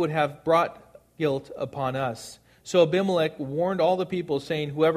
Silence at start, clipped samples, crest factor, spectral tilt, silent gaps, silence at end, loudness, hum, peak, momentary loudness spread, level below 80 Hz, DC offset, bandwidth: 0 s; under 0.1%; 18 dB; -6 dB/octave; none; 0 s; -26 LUFS; none; -6 dBFS; 9 LU; -62 dBFS; under 0.1%; 14.5 kHz